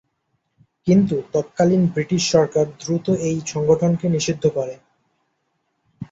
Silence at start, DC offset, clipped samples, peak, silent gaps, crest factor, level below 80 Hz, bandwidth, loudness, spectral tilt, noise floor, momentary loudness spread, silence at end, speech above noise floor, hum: 0.85 s; under 0.1%; under 0.1%; -2 dBFS; none; 18 dB; -56 dBFS; 8 kHz; -20 LUFS; -6 dB/octave; -71 dBFS; 7 LU; 0.1 s; 53 dB; none